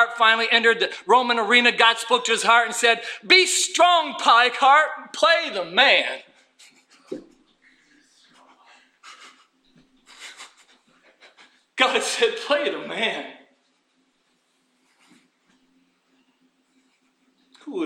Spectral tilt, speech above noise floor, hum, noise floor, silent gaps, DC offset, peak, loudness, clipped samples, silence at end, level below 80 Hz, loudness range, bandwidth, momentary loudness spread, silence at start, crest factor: -0.5 dB/octave; 48 dB; none; -68 dBFS; none; under 0.1%; -2 dBFS; -18 LUFS; under 0.1%; 0 s; -76 dBFS; 12 LU; 16 kHz; 21 LU; 0 s; 20 dB